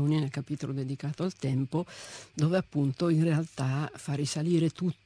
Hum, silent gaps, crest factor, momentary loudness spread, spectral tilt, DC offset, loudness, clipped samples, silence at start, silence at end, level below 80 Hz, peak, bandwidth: none; none; 16 dB; 8 LU; -6.5 dB/octave; under 0.1%; -30 LUFS; under 0.1%; 0 s; 0.15 s; -66 dBFS; -14 dBFS; 10.5 kHz